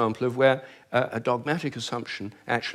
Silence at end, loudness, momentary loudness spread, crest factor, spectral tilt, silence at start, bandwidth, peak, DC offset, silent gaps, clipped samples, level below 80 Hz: 0 s; -27 LUFS; 10 LU; 20 dB; -5.5 dB/octave; 0 s; 13 kHz; -8 dBFS; under 0.1%; none; under 0.1%; -70 dBFS